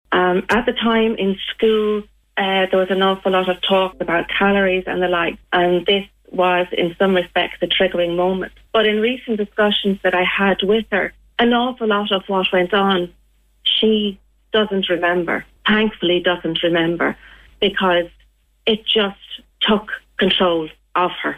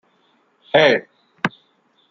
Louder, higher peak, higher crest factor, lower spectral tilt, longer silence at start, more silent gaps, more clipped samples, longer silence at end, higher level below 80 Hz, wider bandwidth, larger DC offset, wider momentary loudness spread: about the same, -18 LUFS vs -18 LUFS; second, -6 dBFS vs -2 dBFS; second, 12 dB vs 20 dB; first, -6.5 dB/octave vs -5 dB/octave; second, 0.1 s vs 0.75 s; neither; neither; second, 0 s vs 0.65 s; first, -48 dBFS vs -68 dBFS; first, 13.5 kHz vs 7.6 kHz; neither; second, 6 LU vs 11 LU